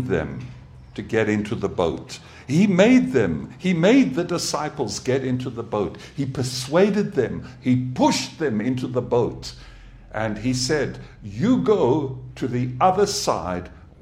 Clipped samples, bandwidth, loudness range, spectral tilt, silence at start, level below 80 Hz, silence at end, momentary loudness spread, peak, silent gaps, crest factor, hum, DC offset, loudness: under 0.1%; 15 kHz; 4 LU; -5.5 dB/octave; 0 s; -48 dBFS; 0.25 s; 15 LU; -4 dBFS; none; 18 dB; none; under 0.1%; -22 LUFS